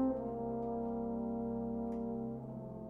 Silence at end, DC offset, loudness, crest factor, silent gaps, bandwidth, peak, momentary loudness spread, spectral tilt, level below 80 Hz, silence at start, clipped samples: 0 s; under 0.1%; -40 LUFS; 12 dB; none; 2.3 kHz; -26 dBFS; 4 LU; -12 dB/octave; -58 dBFS; 0 s; under 0.1%